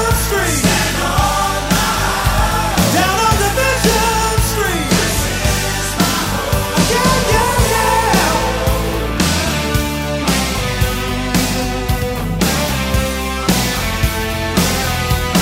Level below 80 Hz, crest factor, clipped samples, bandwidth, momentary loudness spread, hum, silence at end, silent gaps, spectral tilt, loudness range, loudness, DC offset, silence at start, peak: -24 dBFS; 16 dB; under 0.1%; 16.5 kHz; 5 LU; none; 0 s; none; -4 dB/octave; 3 LU; -15 LUFS; under 0.1%; 0 s; 0 dBFS